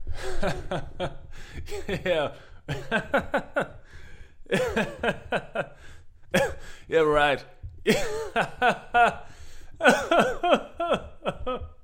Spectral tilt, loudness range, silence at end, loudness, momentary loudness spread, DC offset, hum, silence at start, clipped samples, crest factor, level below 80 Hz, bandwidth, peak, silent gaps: -4.5 dB/octave; 6 LU; 0 s; -26 LUFS; 14 LU; under 0.1%; none; 0 s; under 0.1%; 22 dB; -42 dBFS; 16.5 kHz; -4 dBFS; none